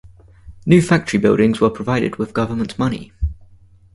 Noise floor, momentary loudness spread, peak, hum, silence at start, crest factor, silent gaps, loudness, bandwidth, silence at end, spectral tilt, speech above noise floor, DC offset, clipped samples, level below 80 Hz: -47 dBFS; 13 LU; 0 dBFS; none; 0.05 s; 18 dB; none; -18 LUFS; 11.5 kHz; 0.6 s; -7 dB/octave; 31 dB; under 0.1%; under 0.1%; -34 dBFS